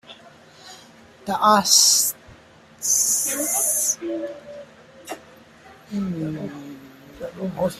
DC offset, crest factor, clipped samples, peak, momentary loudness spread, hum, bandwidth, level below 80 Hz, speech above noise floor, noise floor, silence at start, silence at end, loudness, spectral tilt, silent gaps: under 0.1%; 22 dB; under 0.1%; -2 dBFS; 25 LU; none; 16 kHz; -62 dBFS; 28 dB; -49 dBFS; 0.1 s; 0 s; -19 LUFS; -1.5 dB/octave; none